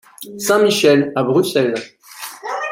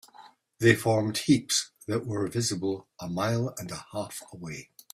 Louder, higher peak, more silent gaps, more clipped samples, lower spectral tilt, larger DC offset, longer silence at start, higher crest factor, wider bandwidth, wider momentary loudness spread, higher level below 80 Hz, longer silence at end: first, -16 LUFS vs -28 LUFS; first, -2 dBFS vs -6 dBFS; neither; neither; about the same, -4.5 dB/octave vs -4.5 dB/octave; neither; about the same, 0.2 s vs 0.2 s; second, 16 dB vs 22 dB; about the same, 16.5 kHz vs 15.5 kHz; first, 19 LU vs 16 LU; about the same, -64 dBFS vs -62 dBFS; second, 0 s vs 0.3 s